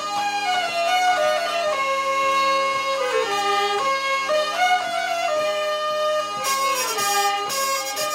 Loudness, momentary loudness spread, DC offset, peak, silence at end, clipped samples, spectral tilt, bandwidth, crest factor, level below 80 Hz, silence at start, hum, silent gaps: -21 LUFS; 4 LU; under 0.1%; -8 dBFS; 0 s; under 0.1%; 0 dB/octave; 16 kHz; 14 dB; -72 dBFS; 0 s; none; none